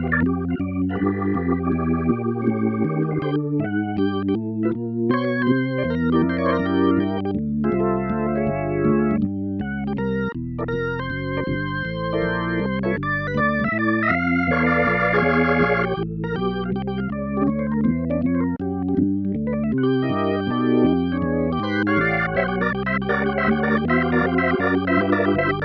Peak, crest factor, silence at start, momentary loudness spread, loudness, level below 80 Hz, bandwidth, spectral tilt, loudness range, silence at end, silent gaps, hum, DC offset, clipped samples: -6 dBFS; 14 dB; 0 s; 6 LU; -21 LUFS; -42 dBFS; 6 kHz; -9.5 dB/octave; 4 LU; 0 s; none; none; under 0.1%; under 0.1%